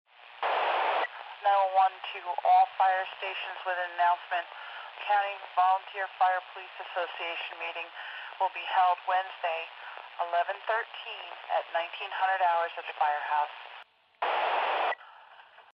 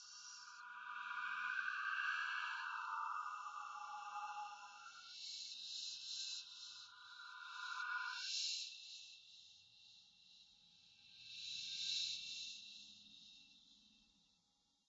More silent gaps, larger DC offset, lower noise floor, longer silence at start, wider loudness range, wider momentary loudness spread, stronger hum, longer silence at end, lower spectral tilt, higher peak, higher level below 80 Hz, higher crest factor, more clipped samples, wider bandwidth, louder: neither; neither; second, -54 dBFS vs -81 dBFS; first, 0.2 s vs 0 s; about the same, 4 LU vs 5 LU; second, 13 LU vs 22 LU; neither; second, 0.15 s vs 0.85 s; first, -1.5 dB/octave vs 6 dB/octave; first, -14 dBFS vs -30 dBFS; about the same, under -90 dBFS vs under -90 dBFS; about the same, 16 dB vs 18 dB; neither; second, 5.6 kHz vs 7.6 kHz; first, -30 LUFS vs -46 LUFS